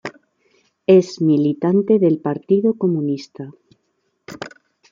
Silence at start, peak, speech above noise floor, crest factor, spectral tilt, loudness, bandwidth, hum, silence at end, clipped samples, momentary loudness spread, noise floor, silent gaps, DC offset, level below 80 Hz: 0.05 s; -2 dBFS; 53 dB; 16 dB; -8 dB/octave; -17 LUFS; 7.6 kHz; none; 0.45 s; under 0.1%; 21 LU; -69 dBFS; none; under 0.1%; -66 dBFS